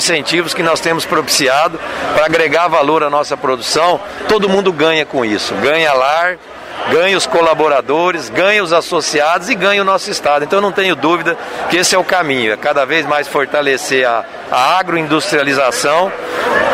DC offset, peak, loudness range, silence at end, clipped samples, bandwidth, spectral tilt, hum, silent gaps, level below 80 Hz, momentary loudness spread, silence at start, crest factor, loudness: under 0.1%; 0 dBFS; 1 LU; 0 s; under 0.1%; 16 kHz; -3 dB/octave; none; none; -50 dBFS; 5 LU; 0 s; 14 dB; -13 LUFS